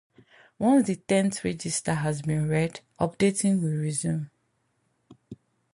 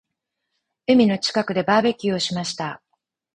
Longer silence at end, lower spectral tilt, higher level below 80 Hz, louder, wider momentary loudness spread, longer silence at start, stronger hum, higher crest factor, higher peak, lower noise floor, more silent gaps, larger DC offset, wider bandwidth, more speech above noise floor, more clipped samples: second, 0.4 s vs 0.6 s; about the same, -5.5 dB/octave vs -5 dB/octave; about the same, -58 dBFS vs -60 dBFS; second, -26 LUFS vs -20 LUFS; second, 8 LU vs 14 LU; second, 0.6 s vs 0.9 s; neither; about the same, 16 dB vs 18 dB; second, -10 dBFS vs -4 dBFS; second, -72 dBFS vs -80 dBFS; neither; neither; about the same, 11.5 kHz vs 10.5 kHz; second, 47 dB vs 60 dB; neither